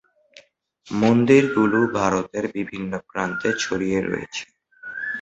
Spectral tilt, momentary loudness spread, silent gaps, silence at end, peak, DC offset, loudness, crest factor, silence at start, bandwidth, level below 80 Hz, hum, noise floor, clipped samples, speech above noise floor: -5.5 dB/octave; 14 LU; none; 0 s; -2 dBFS; under 0.1%; -21 LUFS; 20 dB; 0.85 s; 8.2 kHz; -54 dBFS; none; -55 dBFS; under 0.1%; 34 dB